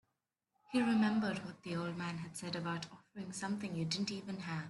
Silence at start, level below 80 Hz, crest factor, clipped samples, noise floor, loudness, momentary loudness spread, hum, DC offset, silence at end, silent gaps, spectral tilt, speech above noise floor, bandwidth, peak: 0.7 s; -76 dBFS; 16 dB; under 0.1%; -87 dBFS; -38 LUFS; 12 LU; none; under 0.1%; 0 s; none; -5 dB/octave; 49 dB; 12 kHz; -22 dBFS